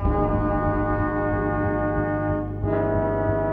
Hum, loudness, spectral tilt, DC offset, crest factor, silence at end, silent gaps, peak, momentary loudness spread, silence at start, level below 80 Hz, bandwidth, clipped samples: 50 Hz at -40 dBFS; -24 LUFS; -11.5 dB/octave; under 0.1%; 14 dB; 0 s; none; -10 dBFS; 2 LU; 0 s; -32 dBFS; 3.7 kHz; under 0.1%